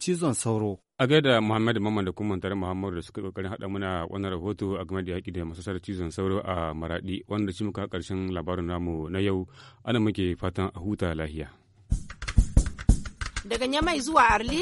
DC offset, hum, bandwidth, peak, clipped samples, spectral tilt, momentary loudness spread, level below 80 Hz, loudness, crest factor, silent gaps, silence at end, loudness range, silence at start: under 0.1%; none; 11.5 kHz; -6 dBFS; under 0.1%; -5.5 dB/octave; 12 LU; -34 dBFS; -28 LUFS; 22 dB; none; 0 s; 5 LU; 0 s